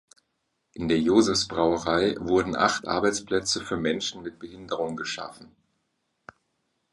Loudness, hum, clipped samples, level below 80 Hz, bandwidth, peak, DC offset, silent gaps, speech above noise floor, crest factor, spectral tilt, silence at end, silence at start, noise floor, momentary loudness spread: -25 LUFS; none; under 0.1%; -54 dBFS; 11.5 kHz; -6 dBFS; under 0.1%; none; 51 dB; 22 dB; -4 dB/octave; 1.5 s; 0.75 s; -77 dBFS; 15 LU